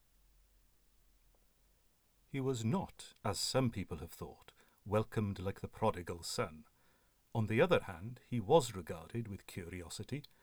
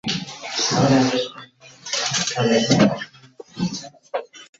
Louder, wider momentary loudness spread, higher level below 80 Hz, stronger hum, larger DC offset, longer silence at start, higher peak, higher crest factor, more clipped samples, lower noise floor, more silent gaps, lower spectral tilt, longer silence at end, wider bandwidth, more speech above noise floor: second, -38 LUFS vs -21 LUFS; about the same, 15 LU vs 17 LU; second, -62 dBFS vs -56 dBFS; neither; neither; first, 2.35 s vs 0.05 s; second, -16 dBFS vs -2 dBFS; about the same, 24 dB vs 20 dB; neither; first, -72 dBFS vs -44 dBFS; neither; first, -5.5 dB/octave vs -4 dB/octave; about the same, 0.2 s vs 0.15 s; first, over 20 kHz vs 8 kHz; first, 35 dB vs 28 dB